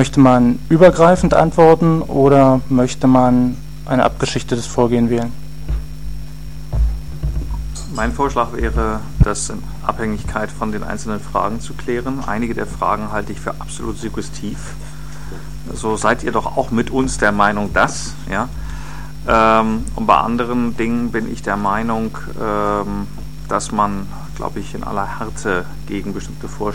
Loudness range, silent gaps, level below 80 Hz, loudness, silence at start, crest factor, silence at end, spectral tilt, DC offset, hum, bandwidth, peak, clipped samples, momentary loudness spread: 10 LU; none; -28 dBFS; -17 LUFS; 0 s; 18 dB; 0 s; -6 dB/octave; 4%; none; 16.5 kHz; 0 dBFS; under 0.1%; 17 LU